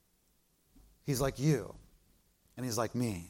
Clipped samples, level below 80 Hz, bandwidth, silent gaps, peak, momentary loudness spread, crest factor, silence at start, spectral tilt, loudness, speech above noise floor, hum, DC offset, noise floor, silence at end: under 0.1%; -56 dBFS; 16.5 kHz; none; -18 dBFS; 16 LU; 18 dB; 1.05 s; -5.5 dB/octave; -34 LUFS; 39 dB; none; under 0.1%; -72 dBFS; 0 s